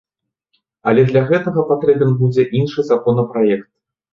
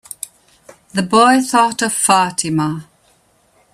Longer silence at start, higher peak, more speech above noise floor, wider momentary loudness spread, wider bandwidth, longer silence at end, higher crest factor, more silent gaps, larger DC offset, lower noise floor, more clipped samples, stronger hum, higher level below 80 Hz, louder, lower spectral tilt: about the same, 0.85 s vs 0.95 s; about the same, -2 dBFS vs 0 dBFS; first, 56 dB vs 42 dB; second, 4 LU vs 19 LU; second, 7 kHz vs 15.5 kHz; second, 0.5 s vs 0.9 s; about the same, 14 dB vs 16 dB; neither; neither; first, -70 dBFS vs -56 dBFS; neither; neither; about the same, -54 dBFS vs -58 dBFS; about the same, -16 LUFS vs -14 LUFS; first, -9 dB/octave vs -3.5 dB/octave